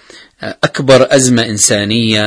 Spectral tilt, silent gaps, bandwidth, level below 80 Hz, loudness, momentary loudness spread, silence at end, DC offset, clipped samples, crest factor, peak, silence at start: -3.5 dB/octave; none; 11 kHz; -46 dBFS; -10 LUFS; 12 LU; 0 s; under 0.1%; 0.7%; 12 dB; 0 dBFS; 0.4 s